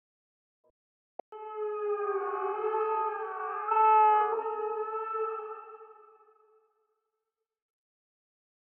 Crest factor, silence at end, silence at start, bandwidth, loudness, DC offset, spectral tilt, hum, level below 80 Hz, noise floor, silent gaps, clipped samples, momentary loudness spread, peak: 18 dB; 2.75 s; 1.3 s; 3.3 kHz; -29 LUFS; under 0.1%; 0.5 dB/octave; none; under -90 dBFS; -87 dBFS; none; under 0.1%; 20 LU; -14 dBFS